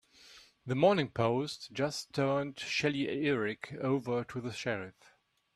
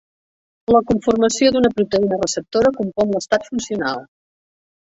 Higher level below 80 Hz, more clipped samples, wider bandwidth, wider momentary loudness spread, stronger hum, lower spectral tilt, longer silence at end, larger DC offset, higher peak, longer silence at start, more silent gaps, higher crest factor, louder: second, -70 dBFS vs -48 dBFS; neither; first, 13.5 kHz vs 8 kHz; about the same, 10 LU vs 8 LU; neither; about the same, -5.5 dB/octave vs -4.5 dB/octave; second, 0.65 s vs 0.8 s; neither; second, -14 dBFS vs -2 dBFS; second, 0.25 s vs 0.7 s; neither; about the same, 20 dB vs 16 dB; second, -33 LUFS vs -18 LUFS